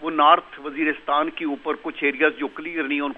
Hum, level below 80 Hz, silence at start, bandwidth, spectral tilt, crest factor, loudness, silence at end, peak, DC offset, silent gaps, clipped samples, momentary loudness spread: none; -62 dBFS; 0 s; 4.4 kHz; -6 dB/octave; 20 dB; -22 LUFS; 0 s; -2 dBFS; under 0.1%; none; under 0.1%; 12 LU